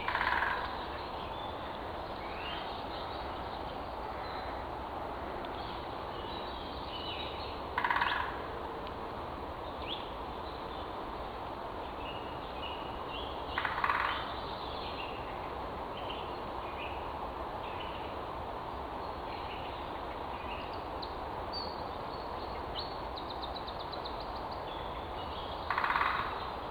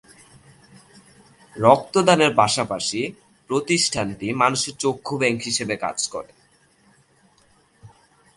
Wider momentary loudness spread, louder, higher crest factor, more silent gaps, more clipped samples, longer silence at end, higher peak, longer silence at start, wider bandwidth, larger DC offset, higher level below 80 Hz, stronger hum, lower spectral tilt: about the same, 9 LU vs 11 LU; second, -38 LUFS vs -21 LUFS; about the same, 24 dB vs 24 dB; neither; neither; second, 0 s vs 0.5 s; second, -14 dBFS vs 0 dBFS; second, 0 s vs 1.55 s; first, over 20 kHz vs 11.5 kHz; neither; first, -50 dBFS vs -58 dBFS; neither; first, -5.5 dB/octave vs -3.5 dB/octave